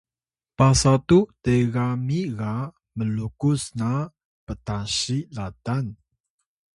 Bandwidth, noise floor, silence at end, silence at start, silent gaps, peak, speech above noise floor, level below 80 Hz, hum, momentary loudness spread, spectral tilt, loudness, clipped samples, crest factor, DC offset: 11.5 kHz; under -90 dBFS; 0.8 s; 0.6 s; 4.25-4.47 s; -4 dBFS; over 68 dB; -44 dBFS; none; 15 LU; -5.5 dB/octave; -23 LUFS; under 0.1%; 20 dB; under 0.1%